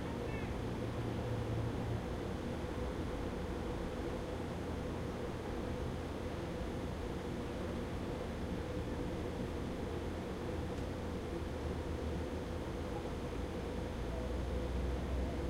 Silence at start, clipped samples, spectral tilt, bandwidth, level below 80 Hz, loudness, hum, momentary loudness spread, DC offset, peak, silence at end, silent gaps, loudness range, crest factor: 0 s; under 0.1%; -7 dB/octave; 16 kHz; -46 dBFS; -41 LUFS; none; 3 LU; under 0.1%; -26 dBFS; 0 s; none; 1 LU; 14 dB